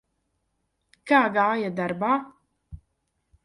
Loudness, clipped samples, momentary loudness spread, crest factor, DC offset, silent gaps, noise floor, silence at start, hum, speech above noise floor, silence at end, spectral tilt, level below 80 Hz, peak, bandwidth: -23 LUFS; under 0.1%; 8 LU; 20 dB; under 0.1%; none; -75 dBFS; 1.05 s; none; 53 dB; 0.7 s; -6.5 dB/octave; -58 dBFS; -6 dBFS; 11.5 kHz